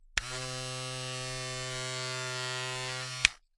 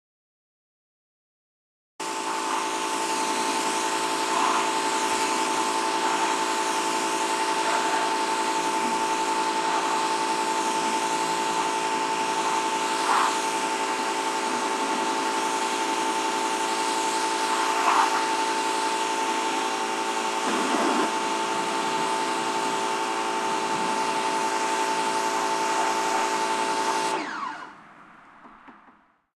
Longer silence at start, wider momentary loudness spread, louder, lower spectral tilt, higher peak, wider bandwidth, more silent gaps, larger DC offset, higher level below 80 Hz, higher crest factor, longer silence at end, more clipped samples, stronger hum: second, 0 s vs 2 s; first, 9 LU vs 3 LU; second, -34 LUFS vs -25 LUFS; about the same, -2 dB/octave vs -1.5 dB/octave; first, -2 dBFS vs -8 dBFS; second, 11.5 kHz vs 14 kHz; neither; neither; first, -54 dBFS vs -72 dBFS; first, 34 dB vs 18 dB; second, 0.2 s vs 0.45 s; neither; neither